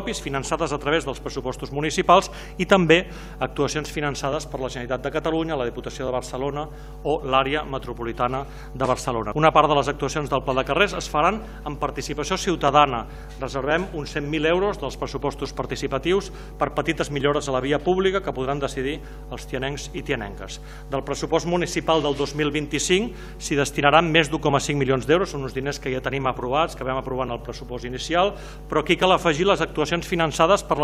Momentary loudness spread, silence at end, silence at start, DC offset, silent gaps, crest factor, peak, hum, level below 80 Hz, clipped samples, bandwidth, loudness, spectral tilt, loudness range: 12 LU; 0 s; 0 s; under 0.1%; none; 22 dB; 0 dBFS; none; -38 dBFS; under 0.1%; 15.5 kHz; -23 LUFS; -4.5 dB/octave; 5 LU